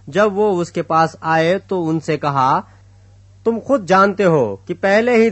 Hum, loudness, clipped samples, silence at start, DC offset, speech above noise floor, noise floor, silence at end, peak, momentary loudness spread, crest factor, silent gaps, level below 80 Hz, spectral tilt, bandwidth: none; -16 LUFS; under 0.1%; 0.05 s; under 0.1%; 30 dB; -45 dBFS; 0 s; 0 dBFS; 8 LU; 16 dB; none; -56 dBFS; -6.5 dB/octave; 8.4 kHz